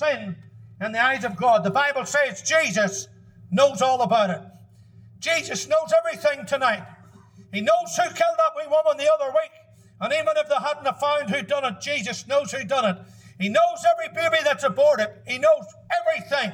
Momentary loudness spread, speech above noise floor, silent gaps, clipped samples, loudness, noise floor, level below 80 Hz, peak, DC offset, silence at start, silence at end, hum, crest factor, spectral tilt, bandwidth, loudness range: 8 LU; 27 dB; none; under 0.1%; -22 LUFS; -49 dBFS; -70 dBFS; -6 dBFS; under 0.1%; 0 s; 0 s; none; 18 dB; -3.5 dB/octave; 15.5 kHz; 3 LU